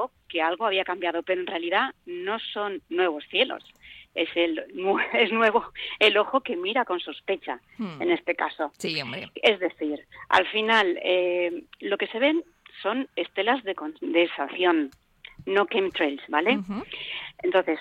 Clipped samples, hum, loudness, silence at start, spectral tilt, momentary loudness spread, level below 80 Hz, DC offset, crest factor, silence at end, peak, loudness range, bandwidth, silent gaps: under 0.1%; none; -25 LUFS; 0 s; -4.5 dB/octave; 12 LU; -66 dBFS; under 0.1%; 20 dB; 0 s; -6 dBFS; 4 LU; 10.5 kHz; none